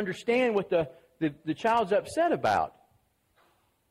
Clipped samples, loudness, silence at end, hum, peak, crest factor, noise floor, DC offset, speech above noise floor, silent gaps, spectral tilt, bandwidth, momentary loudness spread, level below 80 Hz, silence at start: under 0.1%; -28 LUFS; 1.2 s; none; -14 dBFS; 16 dB; -69 dBFS; under 0.1%; 42 dB; none; -5.5 dB/octave; 15 kHz; 8 LU; -64 dBFS; 0 s